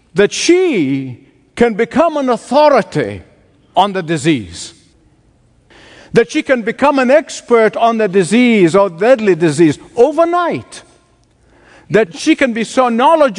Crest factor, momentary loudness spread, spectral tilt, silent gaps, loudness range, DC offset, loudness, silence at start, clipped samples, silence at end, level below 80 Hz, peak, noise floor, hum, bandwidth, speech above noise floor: 14 dB; 9 LU; -5 dB/octave; none; 6 LU; under 0.1%; -12 LUFS; 0.15 s; under 0.1%; 0 s; -52 dBFS; 0 dBFS; -52 dBFS; none; 11 kHz; 40 dB